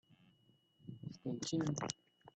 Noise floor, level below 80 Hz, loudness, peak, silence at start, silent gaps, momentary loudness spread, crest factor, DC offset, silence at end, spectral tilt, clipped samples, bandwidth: -73 dBFS; -76 dBFS; -42 LUFS; -20 dBFS; 0.1 s; none; 16 LU; 24 dB; under 0.1%; 0.05 s; -5 dB/octave; under 0.1%; 9 kHz